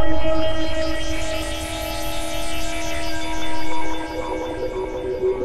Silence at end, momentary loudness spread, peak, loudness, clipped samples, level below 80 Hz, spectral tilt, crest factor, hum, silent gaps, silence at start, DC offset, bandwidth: 0 s; 4 LU; -4 dBFS; -26 LUFS; under 0.1%; -32 dBFS; -4 dB/octave; 12 dB; none; none; 0 s; under 0.1%; 16 kHz